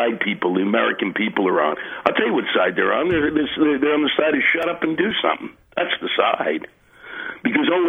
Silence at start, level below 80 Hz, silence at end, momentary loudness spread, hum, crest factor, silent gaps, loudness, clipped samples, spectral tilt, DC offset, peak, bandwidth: 0 s; -56 dBFS; 0 s; 7 LU; none; 18 dB; none; -20 LUFS; under 0.1%; -7 dB/octave; under 0.1%; -2 dBFS; 3.9 kHz